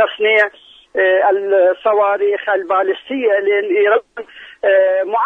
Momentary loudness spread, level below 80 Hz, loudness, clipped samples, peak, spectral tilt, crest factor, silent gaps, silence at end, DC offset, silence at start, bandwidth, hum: 7 LU; -66 dBFS; -15 LUFS; under 0.1%; -2 dBFS; -4.5 dB/octave; 14 dB; none; 0 s; under 0.1%; 0 s; 3.9 kHz; none